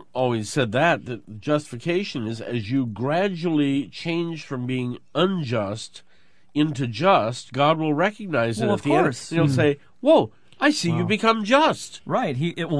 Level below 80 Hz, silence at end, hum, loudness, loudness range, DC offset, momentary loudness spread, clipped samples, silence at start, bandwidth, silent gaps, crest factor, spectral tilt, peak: -62 dBFS; 0 s; none; -23 LUFS; 5 LU; 0.4%; 10 LU; under 0.1%; 0.15 s; 11 kHz; none; 18 dB; -6 dB/octave; -4 dBFS